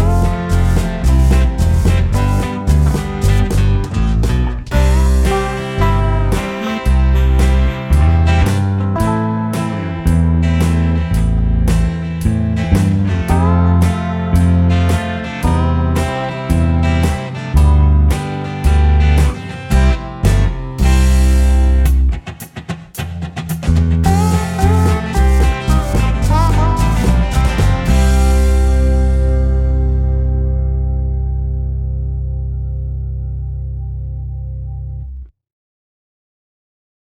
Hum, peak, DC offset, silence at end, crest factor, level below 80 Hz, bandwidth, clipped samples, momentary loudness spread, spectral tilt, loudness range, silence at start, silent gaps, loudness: none; -2 dBFS; under 0.1%; 1.8 s; 12 dB; -16 dBFS; 14 kHz; under 0.1%; 11 LU; -7 dB/octave; 7 LU; 0 s; none; -15 LUFS